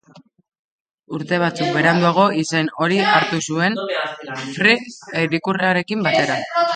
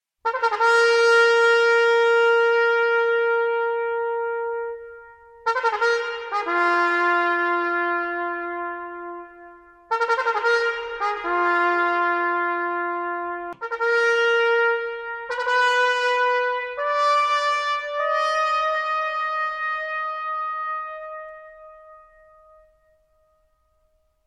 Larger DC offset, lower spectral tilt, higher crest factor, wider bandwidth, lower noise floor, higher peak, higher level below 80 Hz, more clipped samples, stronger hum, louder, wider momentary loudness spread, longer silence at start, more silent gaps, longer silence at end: neither; first, -5 dB/octave vs -1 dB/octave; about the same, 18 dB vs 14 dB; second, 9.4 kHz vs 10.5 kHz; second, -50 dBFS vs -66 dBFS; first, 0 dBFS vs -8 dBFS; about the same, -64 dBFS vs -64 dBFS; neither; neither; first, -18 LUFS vs -21 LUFS; about the same, 10 LU vs 12 LU; about the same, 0.15 s vs 0.25 s; first, 0.59-0.85 s, 0.94-1.03 s vs none; second, 0 s vs 2.3 s